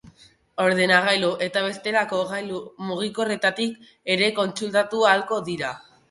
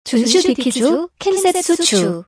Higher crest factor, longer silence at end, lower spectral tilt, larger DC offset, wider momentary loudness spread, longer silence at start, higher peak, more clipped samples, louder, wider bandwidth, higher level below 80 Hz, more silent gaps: first, 20 dB vs 14 dB; first, 0.3 s vs 0.05 s; about the same, -4 dB/octave vs -3.5 dB/octave; neither; first, 13 LU vs 4 LU; about the same, 0.05 s vs 0.05 s; about the same, -4 dBFS vs -2 dBFS; neither; second, -22 LUFS vs -15 LUFS; about the same, 11.5 kHz vs 11 kHz; second, -66 dBFS vs -56 dBFS; neither